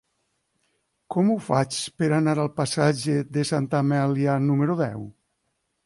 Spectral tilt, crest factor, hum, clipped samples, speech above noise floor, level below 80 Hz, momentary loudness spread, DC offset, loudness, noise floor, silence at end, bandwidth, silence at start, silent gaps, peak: -6 dB/octave; 18 dB; none; under 0.1%; 52 dB; -62 dBFS; 6 LU; under 0.1%; -23 LUFS; -75 dBFS; 0.75 s; 11.5 kHz; 1.1 s; none; -8 dBFS